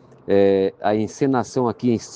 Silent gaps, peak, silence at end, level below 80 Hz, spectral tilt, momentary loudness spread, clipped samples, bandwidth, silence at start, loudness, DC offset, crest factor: none; -6 dBFS; 0 s; -60 dBFS; -6.5 dB/octave; 5 LU; under 0.1%; 9.2 kHz; 0.3 s; -20 LUFS; under 0.1%; 14 dB